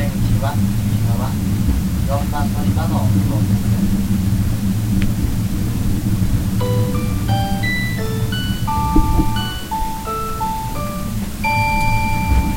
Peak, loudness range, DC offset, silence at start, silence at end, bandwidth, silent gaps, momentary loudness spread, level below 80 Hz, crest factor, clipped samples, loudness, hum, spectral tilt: 0 dBFS; 2 LU; under 0.1%; 0 s; 0 s; 16.5 kHz; none; 6 LU; -24 dBFS; 16 dB; under 0.1%; -19 LUFS; none; -6 dB/octave